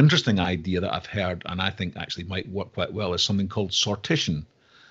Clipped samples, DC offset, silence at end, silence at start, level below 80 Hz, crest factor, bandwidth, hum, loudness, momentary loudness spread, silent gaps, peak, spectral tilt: under 0.1%; under 0.1%; 0.45 s; 0 s; -52 dBFS; 20 dB; 8 kHz; none; -26 LUFS; 8 LU; none; -6 dBFS; -5 dB/octave